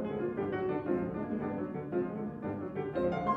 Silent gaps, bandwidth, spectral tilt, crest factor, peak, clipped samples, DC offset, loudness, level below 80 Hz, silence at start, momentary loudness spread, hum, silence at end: none; 5.4 kHz; -10 dB/octave; 16 dB; -18 dBFS; under 0.1%; under 0.1%; -35 LUFS; -60 dBFS; 0 s; 5 LU; none; 0 s